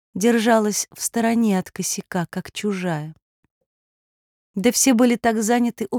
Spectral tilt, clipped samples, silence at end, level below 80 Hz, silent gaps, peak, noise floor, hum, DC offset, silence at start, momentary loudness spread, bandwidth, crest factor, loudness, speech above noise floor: -4 dB/octave; under 0.1%; 0 s; -62 dBFS; 3.22-3.43 s, 3.51-4.54 s; -4 dBFS; under -90 dBFS; none; under 0.1%; 0.15 s; 10 LU; 19.5 kHz; 16 dB; -20 LUFS; over 70 dB